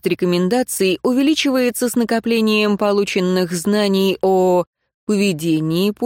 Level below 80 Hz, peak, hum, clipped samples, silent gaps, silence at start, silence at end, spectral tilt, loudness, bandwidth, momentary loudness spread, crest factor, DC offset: -56 dBFS; -4 dBFS; none; under 0.1%; 4.67-4.73 s, 4.94-5.07 s; 0.05 s; 0 s; -5 dB/octave; -17 LUFS; 17 kHz; 3 LU; 12 dB; under 0.1%